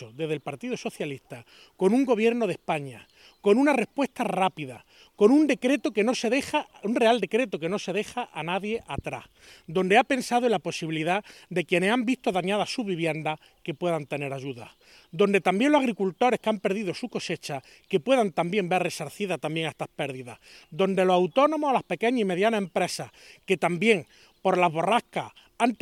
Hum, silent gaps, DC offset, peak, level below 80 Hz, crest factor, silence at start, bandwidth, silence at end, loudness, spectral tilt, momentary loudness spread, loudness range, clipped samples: none; none; under 0.1%; -6 dBFS; -64 dBFS; 20 dB; 0 s; 15.5 kHz; 0.05 s; -26 LUFS; -5 dB/octave; 13 LU; 4 LU; under 0.1%